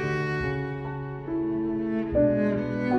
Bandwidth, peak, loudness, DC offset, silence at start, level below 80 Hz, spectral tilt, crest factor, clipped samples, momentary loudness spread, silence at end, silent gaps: 7.8 kHz; -10 dBFS; -27 LUFS; under 0.1%; 0 s; -46 dBFS; -8.5 dB/octave; 16 dB; under 0.1%; 10 LU; 0 s; none